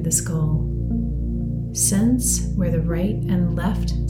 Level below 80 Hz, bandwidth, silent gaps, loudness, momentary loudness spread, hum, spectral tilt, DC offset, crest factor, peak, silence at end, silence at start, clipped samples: -28 dBFS; 18.5 kHz; none; -21 LUFS; 7 LU; none; -5.5 dB/octave; under 0.1%; 16 dB; -4 dBFS; 0 s; 0 s; under 0.1%